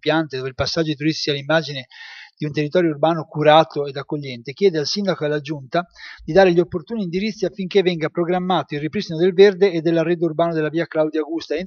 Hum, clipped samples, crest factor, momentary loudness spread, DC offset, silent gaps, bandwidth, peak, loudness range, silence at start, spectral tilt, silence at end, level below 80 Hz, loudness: none; under 0.1%; 20 dB; 13 LU; under 0.1%; none; 7 kHz; 0 dBFS; 2 LU; 0.05 s; -6 dB/octave; 0 s; -52 dBFS; -19 LUFS